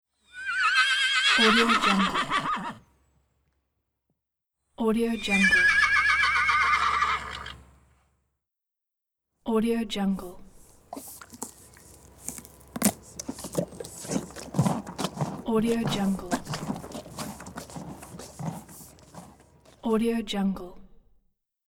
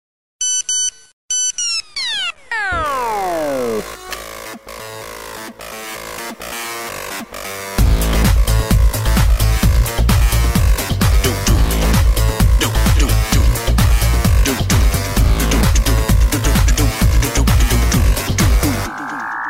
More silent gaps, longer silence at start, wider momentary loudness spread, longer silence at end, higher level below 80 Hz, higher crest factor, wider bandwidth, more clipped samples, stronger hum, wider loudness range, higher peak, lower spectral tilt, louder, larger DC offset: second, none vs 1.13-1.28 s; about the same, 0.35 s vs 0.4 s; first, 21 LU vs 13 LU; first, 0.85 s vs 0 s; second, -52 dBFS vs -16 dBFS; first, 22 dB vs 12 dB; first, over 20 kHz vs 16.5 kHz; neither; neither; first, 12 LU vs 9 LU; second, -6 dBFS vs -2 dBFS; about the same, -3.5 dB/octave vs -4 dB/octave; second, -24 LUFS vs -16 LUFS; neither